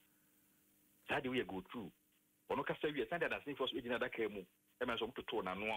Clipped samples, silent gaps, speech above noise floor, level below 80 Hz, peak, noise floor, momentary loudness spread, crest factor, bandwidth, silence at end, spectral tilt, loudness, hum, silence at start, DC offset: under 0.1%; none; 32 dB; -72 dBFS; -26 dBFS; -74 dBFS; 11 LU; 18 dB; 16 kHz; 0 s; -5.5 dB/octave; -42 LUFS; none; 1.05 s; under 0.1%